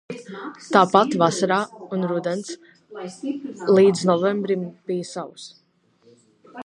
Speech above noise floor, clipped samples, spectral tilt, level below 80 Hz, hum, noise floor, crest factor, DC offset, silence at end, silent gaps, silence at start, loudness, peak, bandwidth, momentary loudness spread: 37 dB; under 0.1%; -5.5 dB/octave; -72 dBFS; none; -59 dBFS; 22 dB; under 0.1%; 0.05 s; none; 0.1 s; -21 LUFS; 0 dBFS; 11 kHz; 20 LU